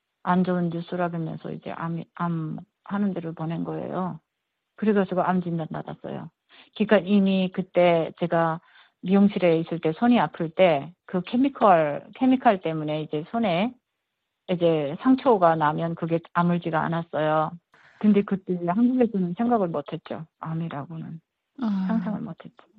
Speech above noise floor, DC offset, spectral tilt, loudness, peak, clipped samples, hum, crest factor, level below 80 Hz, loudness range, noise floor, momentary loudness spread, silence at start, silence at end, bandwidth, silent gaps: 57 dB; under 0.1%; -10.5 dB/octave; -24 LUFS; -4 dBFS; under 0.1%; none; 20 dB; -66 dBFS; 7 LU; -81 dBFS; 15 LU; 0.25 s; 0.3 s; 4.8 kHz; none